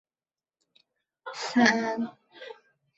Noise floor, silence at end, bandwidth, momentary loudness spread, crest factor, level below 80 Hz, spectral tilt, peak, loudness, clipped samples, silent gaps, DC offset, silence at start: under -90 dBFS; 0.45 s; 8 kHz; 24 LU; 24 dB; -76 dBFS; -3.5 dB/octave; -6 dBFS; -26 LUFS; under 0.1%; none; under 0.1%; 1.25 s